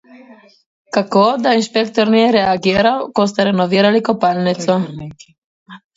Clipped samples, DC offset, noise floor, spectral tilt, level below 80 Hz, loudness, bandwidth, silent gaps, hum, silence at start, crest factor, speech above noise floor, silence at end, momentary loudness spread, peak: under 0.1%; under 0.1%; -43 dBFS; -5.5 dB/octave; -52 dBFS; -15 LUFS; 8 kHz; 0.66-0.85 s, 5.38-5.66 s; none; 0.3 s; 16 dB; 29 dB; 0.2 s; 7 LU; 0 dBFS